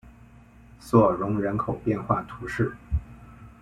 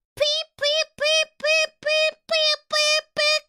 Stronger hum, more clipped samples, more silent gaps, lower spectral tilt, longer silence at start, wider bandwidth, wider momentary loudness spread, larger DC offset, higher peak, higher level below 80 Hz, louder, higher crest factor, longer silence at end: neither; neither; neither; first, -8.5 dB/octave vs 1.5 dB/octave; about the same, 0.05 s vs 0.15 s; second, 13.5 kHz vs 15.5 kHz; first, 12 LU vs 3 LU; neither; about the same, -6 dBFS vs -8 dBFS; first, -40 dBFS vs -66 dBFS; second, -26 LUFS vs -20 LUFS; first, 20 dB vs 14 dB; about the same, 0.1 s vs 0.1 s